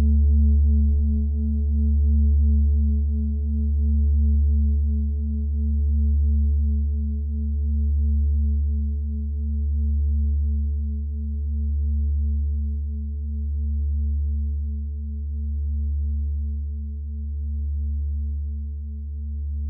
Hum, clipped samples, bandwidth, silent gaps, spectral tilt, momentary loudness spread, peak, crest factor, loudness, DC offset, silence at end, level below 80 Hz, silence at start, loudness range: none; under 0.1%; 0.7 kHz; none; -17 dB/octave; 10 LU; -12 dBFS; 10 dB; -24 LUFS; under 0.1%; 0 s; -22 dBFS; 0 s; 7 LU